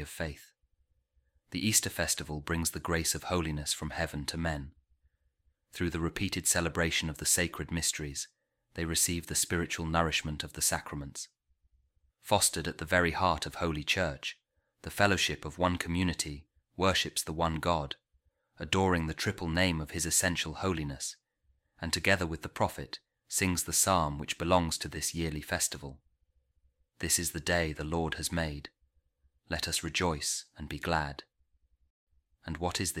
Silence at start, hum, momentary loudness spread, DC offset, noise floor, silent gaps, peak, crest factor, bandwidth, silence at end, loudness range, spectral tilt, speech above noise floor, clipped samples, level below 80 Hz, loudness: 0 s; none; 14 LU; under 0.1%; -74 dBFS; 31.90-32.07 s; -10 dBFS; 24 dB; 16.5 kHz; 0 s; 4 LU; -3 dB/octave; 43 dB; under 0.1%; -50 dBFS; -31 LUFS